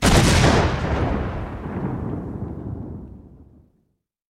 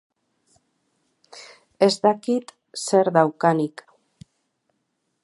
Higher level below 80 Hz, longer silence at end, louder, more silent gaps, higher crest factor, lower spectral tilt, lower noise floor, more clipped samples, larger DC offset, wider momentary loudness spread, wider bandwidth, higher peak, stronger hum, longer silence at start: first, -30 dBFS vs -74 dBFS; second, 0.9 s vs 1.55 s; about the same, -22 LUFS vs -21 LUFS; neither; about the same, 20 dB vs 22 dB; about the same, -5 dB/octave vs -5 dB/octave; second, -70 dBFS vs -74 dBFS; neither; neither; second, 18 LU vs 22 LU; first, 16 kHz vs 11.5 kHz; about the same, -2 dBFS vs -2 dBFS; neither; second, 0 s vs 1.35 s